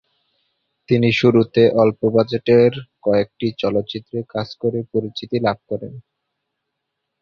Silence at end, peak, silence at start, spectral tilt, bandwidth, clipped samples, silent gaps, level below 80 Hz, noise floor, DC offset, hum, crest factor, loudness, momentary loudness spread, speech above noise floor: 1.2 s; -2 dBFS; 0.9 s; -8 dB/octave; 7 kHz; under 0.1%; none; -54 dBFS; -78 dBFS; under 0.1%; none; 18 dB; -18 LUFS; 13 LU; 60 dB